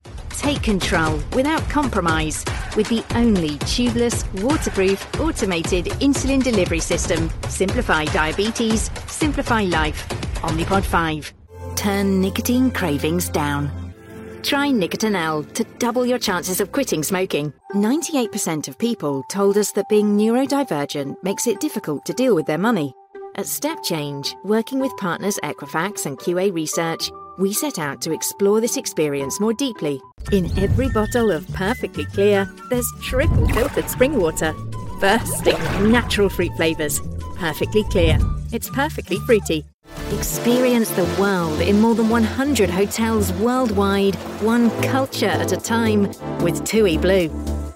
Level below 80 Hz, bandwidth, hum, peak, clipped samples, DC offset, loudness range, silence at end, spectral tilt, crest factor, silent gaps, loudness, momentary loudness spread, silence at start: -34 dBFS; 16.5 kHz; none; -2 dBFS; under 0.1%; under 0.1%; 3 LU; 0 s; -5 dB/octave; 18 dB; 39.74-39.80 s; -20 LUFS; 8 LU; 0.05 s